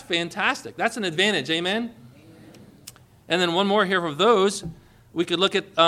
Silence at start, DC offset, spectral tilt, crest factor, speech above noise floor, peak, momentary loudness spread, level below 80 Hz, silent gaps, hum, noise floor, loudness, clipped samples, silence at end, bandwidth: 0 s; under 0.1%; -4 dB/octave; 20 dB; 25 dB; -4 dBFS; 9 LU; -60 dBFS; none; none; -48 dBFS; -22 LUFS; under 0.1%; 0 s; 15.5 kHz